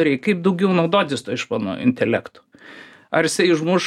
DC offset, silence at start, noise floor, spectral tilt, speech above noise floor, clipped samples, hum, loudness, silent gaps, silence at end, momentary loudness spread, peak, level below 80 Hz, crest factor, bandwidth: under 0.1%; 0 s; -43 dBFS; -5 dB/octave; 24 dB; under 0.1%; none; -20 LUFS; none; 0 s; 7 LU; -2 dBFS; -64 dBFS; 18 dB; 14.5 kHz